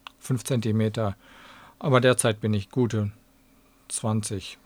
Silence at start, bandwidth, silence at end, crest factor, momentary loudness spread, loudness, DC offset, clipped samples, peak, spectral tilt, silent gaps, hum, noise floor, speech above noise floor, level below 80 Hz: 0.25 s; 15.5 kHz; 0.1 s; 22 dB; 12 LU; -26 LUFS; under 0.1%; under 0.1%; -4 dBFS; -5.5 dB/octave; none; none; -59 dBFS; 34 dB; -60 dBFS